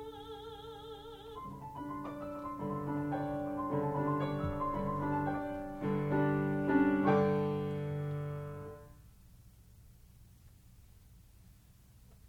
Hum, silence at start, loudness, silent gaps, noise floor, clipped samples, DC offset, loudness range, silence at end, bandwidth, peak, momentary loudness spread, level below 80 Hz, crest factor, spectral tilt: none; 0 s; -35 LUFS; none; -60 dBFS; under 0.1%; under 0.1%; 11 LU; 0 s; 16.5 kHz; -18 dBFS; 18 LU; -58 dBFS; 20 dB; -8.5 dB/octave